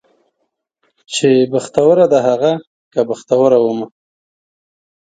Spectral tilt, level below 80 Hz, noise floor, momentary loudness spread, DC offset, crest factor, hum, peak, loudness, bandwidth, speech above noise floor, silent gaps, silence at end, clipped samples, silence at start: -5.5 dB/octave; -60 dBFS; -71 dBFS; 12 LU; under 0.1%; 16 dB; none; 0 dBFS; -14 LUFS; 9.4 kHz; 58 dB; 2.67-2.91 s; 1.2 s; under 0.1%; 1.1 s